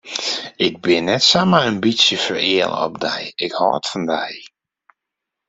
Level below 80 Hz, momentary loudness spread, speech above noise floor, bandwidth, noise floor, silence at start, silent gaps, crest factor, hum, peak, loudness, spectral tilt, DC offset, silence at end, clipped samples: -58 dBFS; 10 LU; 64 dB; 8.2 kHz; -82 dBFS; 0.05 s; none; 18 dB; none; 0 dBFS; -17 LUFS; -3.5 dB/octave; under 0.1%; 1 s; under 0.1%